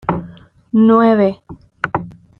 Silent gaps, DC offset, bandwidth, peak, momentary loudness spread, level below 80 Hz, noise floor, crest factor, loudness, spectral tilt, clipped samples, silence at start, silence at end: none; under 0.1%; 4.5 kHz; 0 dBFS; 15 LU; -48 dBFS; -39 dBFS; 14 dB; -15 LUFS; -9.5 dB/octave; under 0.1%; 0.1 s; 0.3 s